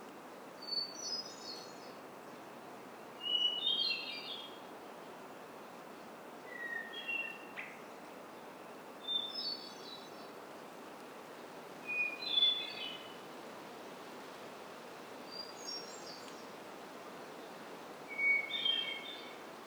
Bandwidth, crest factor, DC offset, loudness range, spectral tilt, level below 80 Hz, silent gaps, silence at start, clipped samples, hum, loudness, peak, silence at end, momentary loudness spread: over 20 kHz; 22 dB; under 0.1%; 10 LU; -1 dB/octave; -90 dBFS; none; 0 s; under 0.1%; none; -38 LUFS; -20 dBFS; 0 s; 19 LU